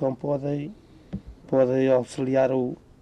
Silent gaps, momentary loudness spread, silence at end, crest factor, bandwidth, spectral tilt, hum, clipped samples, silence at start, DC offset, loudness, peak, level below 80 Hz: none; 18 LU; 0.25 s; 16 dB; 10.5 kHz; -8 dB/octave; none; under 0.1%; 0 s; under 0.1%; -24 LUFS; -10 dBFS; -52 dBFS